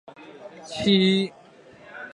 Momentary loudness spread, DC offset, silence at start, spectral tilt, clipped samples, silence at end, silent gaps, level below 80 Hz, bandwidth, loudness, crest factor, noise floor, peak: 24 LU; under 0.1%; 0.2 s; -6 dB/octave; under 0.1%; 0.05 s; none; -60 dBFS; 10.5 kHz; -22 LUFS; 18 dB; -49 dBFS; -6 dBFS